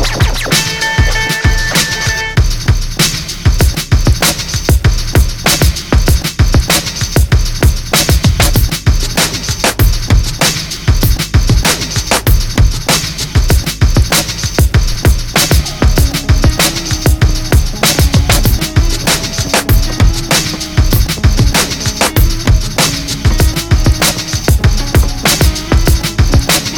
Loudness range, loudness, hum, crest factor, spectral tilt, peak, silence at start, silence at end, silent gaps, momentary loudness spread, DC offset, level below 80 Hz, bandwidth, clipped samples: 1 LU; -11 LUFS; none; 10 dB; -3.5 dB/octave; 0 dBFS; 0 s; 0 s; none; 3 LU; under 0.1%; -14 dBFS; 19.5 kHz; under 0.1%